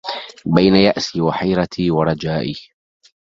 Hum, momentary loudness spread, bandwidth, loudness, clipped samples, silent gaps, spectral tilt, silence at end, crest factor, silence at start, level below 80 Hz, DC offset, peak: none; 14 LU; 7.6 kHz; -17 LUFS; under 0.1%; none; -6.5 dB/octave; 0.6 s; 18 dB; 0.05 s; -46 dBFS; under 0.1%; 0 dBFS